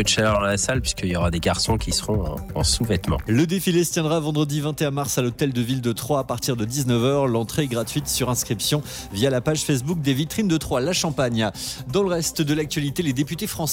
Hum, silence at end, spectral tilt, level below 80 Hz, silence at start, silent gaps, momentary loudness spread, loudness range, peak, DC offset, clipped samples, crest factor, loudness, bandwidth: none; 0 s; -4.5 dB/octave; -38 dBFS; 0 s; none; 5 LU; 1 LU; -8 dBFS; under 0.1%; under 0.1%; 14 dB; -22 LUFS; 17 kHz